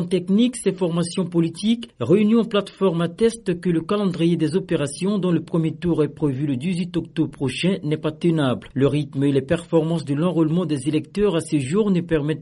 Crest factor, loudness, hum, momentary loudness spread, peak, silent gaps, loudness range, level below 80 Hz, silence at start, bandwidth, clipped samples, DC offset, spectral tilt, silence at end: 14 dB; -21 LUFS; none; 4 LU; -6 dBFS; none; 2 LU; -50 dBFS; 0 s; 11.5 kHz; under 0.1%; under 0.1%; -7 dB/octave; 0 s